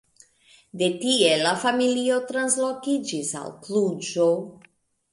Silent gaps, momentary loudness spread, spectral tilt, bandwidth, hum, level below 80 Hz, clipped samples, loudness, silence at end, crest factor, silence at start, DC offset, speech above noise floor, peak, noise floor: none; 9 LU; -3 dB/octave; 11.5 kHz; none; -72 dBFS; under 0.1%; -23 LUFS; 0.6 s; 18 dB; 0.75 s; under 0.1%; 34 dB; -6 dBFS; -57 dBFS